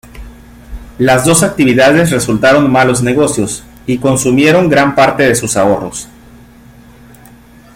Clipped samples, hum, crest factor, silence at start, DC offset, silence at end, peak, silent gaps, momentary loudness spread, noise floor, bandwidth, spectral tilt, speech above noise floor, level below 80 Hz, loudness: under 0.1%; none; 12 dB; 0.15 s; under 0.1%; 1.7 s; 0 dBFS; none; 10 LU; -39 dBFS; 16.5 kHz; -4.5 dB/octave; 29 dB; -36 dBFS; -10 LUFS